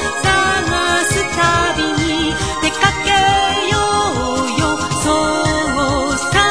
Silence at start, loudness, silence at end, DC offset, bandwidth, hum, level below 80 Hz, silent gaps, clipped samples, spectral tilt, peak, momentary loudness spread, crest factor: 0 s; -15 LUFS; 0 s; 1%; 11 kHz; none; -32 dBFS; none; under 0.1%; -3.5 dB/octave; 0 dBFS; 4 LU; 16 dB